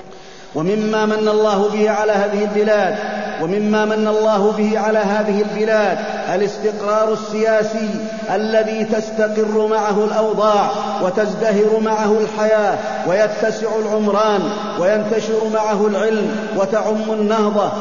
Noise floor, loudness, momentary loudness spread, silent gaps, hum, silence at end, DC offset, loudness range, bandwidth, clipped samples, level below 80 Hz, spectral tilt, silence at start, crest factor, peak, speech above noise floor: -38 dBFS; -17 LUFS; 5 LU; none; none; 0 s; 0.9%; 2 LU; 7.4 kHz; under 0.1%; -56 dBFS; -5.5 dB/octave; 0 s; 14 dB; -2 dBFS; 22 dB